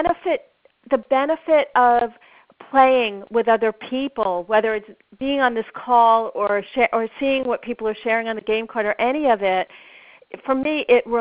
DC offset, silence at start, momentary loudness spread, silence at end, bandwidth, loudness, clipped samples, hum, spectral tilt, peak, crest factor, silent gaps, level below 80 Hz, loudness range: under 0.1%; 0 s; 10 LU; 0 s; 5 kHz; -20 LUFS; under 0.1%; none; -1.5 dB/octave; -4 dBFS; 16 dB; none; -56 dBFS; 3 LU